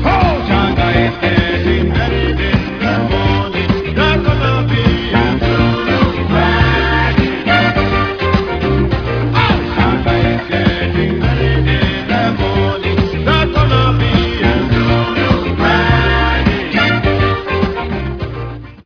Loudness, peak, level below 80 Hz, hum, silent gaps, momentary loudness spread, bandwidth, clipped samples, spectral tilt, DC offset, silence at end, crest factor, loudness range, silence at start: -13 LUFS; 0 dBFS; -22 dBFS; none; none; 4 LU; 5.4 kHz; under 0.1%; -7.5 dB/octave; under 0.1%; 0.05 s; 12 dB; 1 LU; 0 s